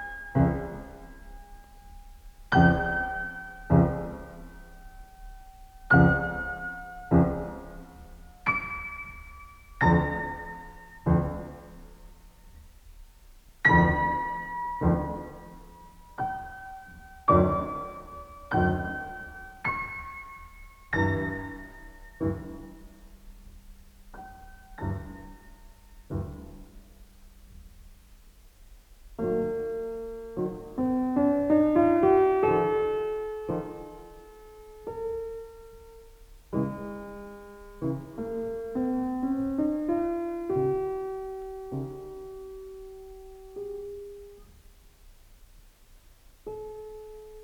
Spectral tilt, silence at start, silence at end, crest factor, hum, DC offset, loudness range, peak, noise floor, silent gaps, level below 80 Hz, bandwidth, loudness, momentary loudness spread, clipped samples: -8.5 dB/octave; 0 s; 0 s; 24 dB; none; under 0.1%; 17 LU; -6 dBFS; -55 dBFS; none; -46 dBFS; 18 kHz; -28 LUFS; 25 LU; under 0.1%